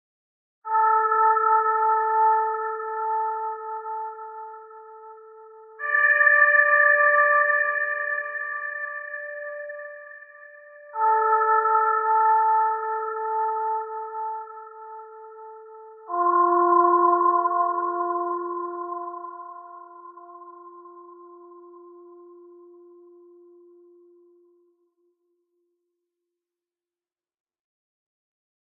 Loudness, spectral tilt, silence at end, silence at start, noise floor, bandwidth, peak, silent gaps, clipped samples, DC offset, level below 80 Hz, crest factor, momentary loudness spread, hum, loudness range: -21 LUFS; 10.5 dB/octave; 6.4 s; 0.65 s; under -90 dBFS; 3.2 kHz; -6 dBFS; none; under 0.1%; under 0.1%; under -90 dBFS; 20 dB; 24 LU; none; 13 LU